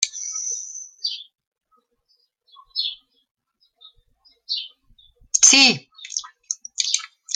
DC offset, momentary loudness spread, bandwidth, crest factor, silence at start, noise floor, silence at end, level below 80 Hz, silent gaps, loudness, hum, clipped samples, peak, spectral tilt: under 0.1%; 18 LU; 13.5 kHz; 24 dB; 0 s; -67 dBFS; 0 s; -68 dBFS; 1.47-1.52 s, 3.31-3.35 s; -19 LUFS; none; under 0.1%; 0 dBFS; 1 dB/octave